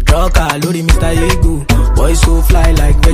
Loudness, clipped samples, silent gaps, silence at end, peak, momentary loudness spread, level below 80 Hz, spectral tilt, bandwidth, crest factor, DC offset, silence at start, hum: -12 LUFS; 0.2%; none; 0 s; 0 dBFS; 3 LU; -10 dBFS; -5 dB/octave; 15.5 kHz; 8 dB; under 0.1%; 0 s; none